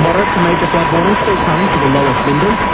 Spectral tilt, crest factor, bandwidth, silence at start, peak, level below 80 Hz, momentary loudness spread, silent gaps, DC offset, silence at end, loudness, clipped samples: -10.5 dB/octave; 12 dB; 4 kHz; 0 s; 0 dBFS; -32 dBFS; 1 LU; none; under 0.1%; 0 s; -12 LUFS; under 0.1%